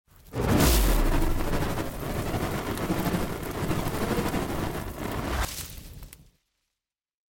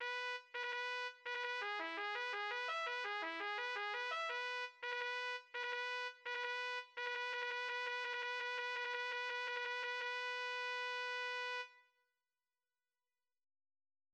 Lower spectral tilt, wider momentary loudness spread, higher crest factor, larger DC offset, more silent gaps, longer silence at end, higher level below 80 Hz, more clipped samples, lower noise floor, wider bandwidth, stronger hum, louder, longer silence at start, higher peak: first, -5 dB/octave vs 1 dB/octave; first, 14 LU vs 3 LU; about the same, 20 dB vs 16 dB; neither; neither; second, 1.25 s vs 2.35 s; first, -32 dBFS vs under -90 dBFS; neither; about the same, -87 dBFS vs under -90 dBFS; first, 17 kHz vs 10.5 kHz; neither; first, -28 LUFS vs -42 LUFS; first, 0.25 s vs 0 s; first, -8 dBFS vs -28 dBFS